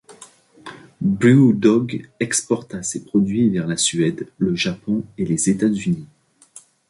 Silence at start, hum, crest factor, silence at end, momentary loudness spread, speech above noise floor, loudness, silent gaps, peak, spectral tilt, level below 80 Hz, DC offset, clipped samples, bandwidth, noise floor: 0.1 s; none; 18 dB; 0.85 s; 12 LU; 29 dB; -19 LUFS; none; -2 dBFS; -5 dB/octave; -54 dBFS; under 0.1%; under 0.1%; 11.5 kHz; -48 dBFS